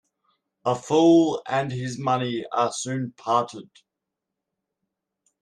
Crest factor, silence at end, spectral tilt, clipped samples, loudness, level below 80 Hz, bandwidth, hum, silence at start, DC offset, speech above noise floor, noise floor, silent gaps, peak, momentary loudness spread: 18 dB; 1.8 s; -5.5 dB/octave; under 0.1%; -23 LUFS; -68 dBFS; 10 kHz; none; 0.65 s; under 0.1%; 62 dB; -84 dBFS; none; -8 dBFS; 13 LU